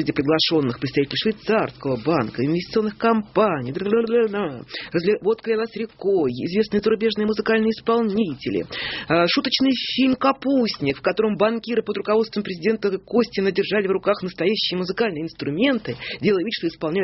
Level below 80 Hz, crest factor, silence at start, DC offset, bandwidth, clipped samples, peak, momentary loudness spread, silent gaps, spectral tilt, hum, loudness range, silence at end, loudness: -56 dBFS; 16 dB; 0 s; under 0.1%; 6 kHz; under 0.1%; -4 dBFS; 6 LU; none; -4 dB/octave; none; 2 LU; 0 s; -22 LUFS